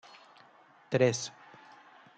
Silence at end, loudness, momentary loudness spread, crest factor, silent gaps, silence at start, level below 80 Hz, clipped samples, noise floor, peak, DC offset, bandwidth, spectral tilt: 0.9 s; -30 LUFS; 26 LU; 24 dB; none; 0.9 s; -78 dBFS; under 0.1%; -60 dBFS; -12 dBFS; under 0.1%; 9.2 kHz; -4.5 dB/octave